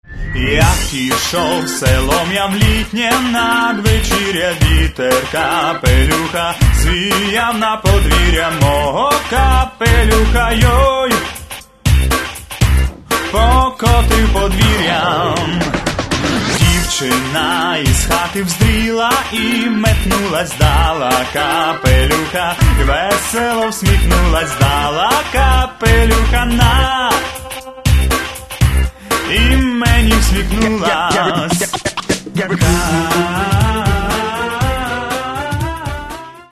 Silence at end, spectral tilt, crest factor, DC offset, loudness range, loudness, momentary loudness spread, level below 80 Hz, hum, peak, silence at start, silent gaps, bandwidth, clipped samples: 0.1 s; -4.5 dB/octave; 14 dB; under 0.1%; 2 LU; -14 LUFS; 6 LU; -18 dBFS; none; 0 dBFS; 0.1 s; none; 13.5 kHz; under 0.1%